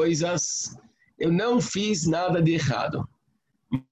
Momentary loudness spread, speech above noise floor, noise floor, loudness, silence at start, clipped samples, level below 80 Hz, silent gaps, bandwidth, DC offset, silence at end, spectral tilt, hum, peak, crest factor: 10 LU; 48 dB; -73 dBFS; -25 LUFS; 0 s; under 0.1%; -56 dBFS; none; 9 kHz; under 0.1%; 0.1 s; -5 dB/octave; none; -12 dBFS; 14 dB